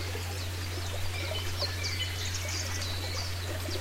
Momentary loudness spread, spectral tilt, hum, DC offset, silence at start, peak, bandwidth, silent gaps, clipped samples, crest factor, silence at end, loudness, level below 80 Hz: 3 LU; -3 dB/octave; none; under 0.1%; 0 s; -18 dBFS; 16 kHz; none; under 0.1%; 16 dB; 0 s; -33 LUFS; -46 dBFS